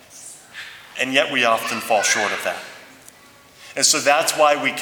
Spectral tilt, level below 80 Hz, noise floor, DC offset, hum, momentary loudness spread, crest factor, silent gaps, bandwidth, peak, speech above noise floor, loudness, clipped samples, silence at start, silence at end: -0.5 dB/octave; -68 dBFS; -48 dBFS; under 0.1%; none; 20 LU; 20 dB; none; over 20 kHz; 0 dBFS; 30 dB; -18 LUFS; under 0.1%; 0.15 s; 0 s